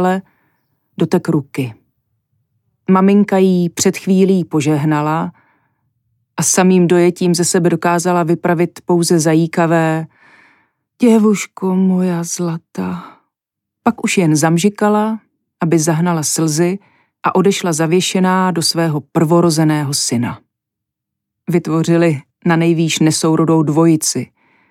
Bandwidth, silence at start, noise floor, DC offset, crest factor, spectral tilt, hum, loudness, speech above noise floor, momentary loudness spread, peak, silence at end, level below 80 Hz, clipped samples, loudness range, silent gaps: 15.5 kHz; 0 s; -81 dBFS; under 0.1%; 14 dB; -5 dB/octave; none; -14 LUFS; 67 dB; 11 LU; -2 dBFS; 0.45 s; -64 dBFS; under 0.1%; 3 LU; none